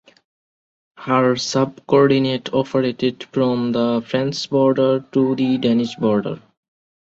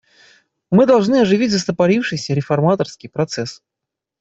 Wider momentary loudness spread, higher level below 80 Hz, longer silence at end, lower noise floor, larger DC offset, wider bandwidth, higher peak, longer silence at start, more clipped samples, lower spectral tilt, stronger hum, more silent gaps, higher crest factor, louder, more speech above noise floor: second, 6 LU vs 11 LU; about the same, -60 dBFS vs -56 dBFS; about the same, 0.65 s vs 0.65 s; first, under -90 dBFS vs -83 dBFS; neither; about the same, 8 kHz vs 8 kHz; about the same, -2 dBFS vs -2 dBFS; first, 1 s vs 0.7 s; neither; about the same, -6 dB/octave vs -6 dB/octave; neither; neither; about the same, 16 dB vs 14 dB; about the same, -18 LUFS vs -16 LUFS; first, over 72 dB vs 67 dB